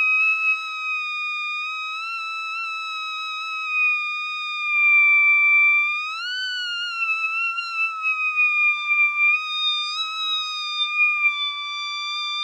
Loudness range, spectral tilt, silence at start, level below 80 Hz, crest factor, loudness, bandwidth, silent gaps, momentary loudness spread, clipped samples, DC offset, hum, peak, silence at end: 7 LU; 10 dB/octave; 0 s; under -90 dBFS; 12 dB; -20 LUFS; 9.6 kHz; none; 13 LU; under 0.1%; under 0.1%; none; -10 dBFS; 0 s